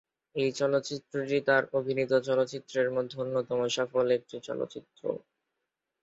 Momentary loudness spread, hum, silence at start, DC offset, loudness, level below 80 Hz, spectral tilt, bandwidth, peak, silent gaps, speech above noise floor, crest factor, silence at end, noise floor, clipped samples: 10 LU; none; 0.35 s; under 0.1%; -30 LUFS; -74 dBFS; -4.5 dB/octave; 8 kHz; -12 dBFS; none; 56 dB; 18 dB; 0.85 s; -85 dBFS; under 0.1%